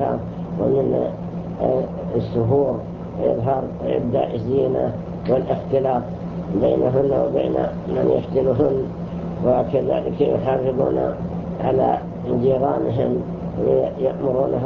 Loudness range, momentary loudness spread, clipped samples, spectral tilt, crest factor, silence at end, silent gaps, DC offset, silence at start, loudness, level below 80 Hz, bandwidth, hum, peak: 2 LU; 8 LU; under 0.1%; -10.5 dB/octave; 16 dB; 0 s; none; under 0.1%; 0 s; -21 LUFS; -42 dBFS; 6.2 kHz; none; -4 dBFS